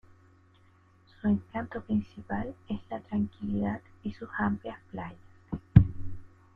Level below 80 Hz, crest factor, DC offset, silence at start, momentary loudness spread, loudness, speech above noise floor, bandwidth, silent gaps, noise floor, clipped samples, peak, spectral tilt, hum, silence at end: -44 dBFS; 28 dB; under 0.1%; 1.25 s; 19 LU; -31 LUFS; 28 dB; 4.7 kHz; none; -61 dBFS; under 0.1%; -2 dBFS; -10.5 dB/octave; none; 0.3 s